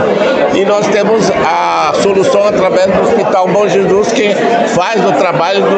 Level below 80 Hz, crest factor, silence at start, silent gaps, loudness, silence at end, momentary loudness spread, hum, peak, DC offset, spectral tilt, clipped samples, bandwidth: -46 dBFS; 8 dB; 0 s; none; -10 LUFS; 0 s; 1 LU; none; 0 dBFS; under 0.1%; -5 dB/octave; under 0.1%; 9 kHz